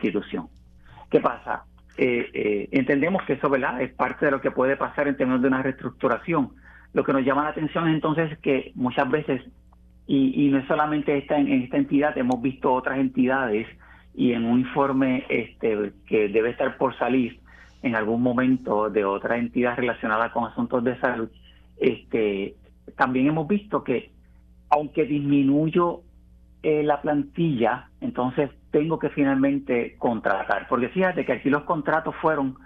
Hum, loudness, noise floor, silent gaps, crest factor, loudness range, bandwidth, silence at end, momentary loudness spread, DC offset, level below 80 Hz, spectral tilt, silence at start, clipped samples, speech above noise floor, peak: none; -24 LUFS; -52 dBFS; none; 20 dB; 2 LU; 4.6 kHz; 0.1 s; 6 LU; under 0.1%; -54 dBFS; -9 dB/octave; 0 s; under 0.1%; 29 dB; -4 dBFS